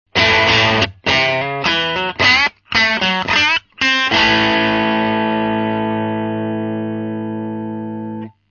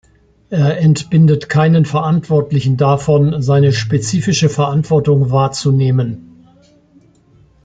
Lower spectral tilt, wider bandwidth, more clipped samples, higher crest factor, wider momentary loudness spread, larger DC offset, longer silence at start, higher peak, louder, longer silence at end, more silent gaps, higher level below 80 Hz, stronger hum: second, -4 dB/octave vs -6.5 dB/octave; second, 7 kHz vs 9.2 kHz; neither; about the same, 16 dB vs 12 dB; first, 13 LU vs 5 LU; neither; second, 0.15 s vs 0.5 s; about the same, 0 dBFS vs -2 dBFS; about the same, -15 LUFS vs -13 LUFS; second, 0.2 s vs 1.45 s; neither; about the same, -44 dBFS vs -46 dBFS; neither